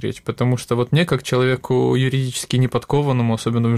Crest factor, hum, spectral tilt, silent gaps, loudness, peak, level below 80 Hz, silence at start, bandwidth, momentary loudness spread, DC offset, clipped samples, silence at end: 14 dB; none; -6 dB/octave; none; -19 LUFS; -4 dBFS; -50 dBFS; 0 s; 13.5 kHz; 3 LU; under 0.1%; under 0.1%; 0 s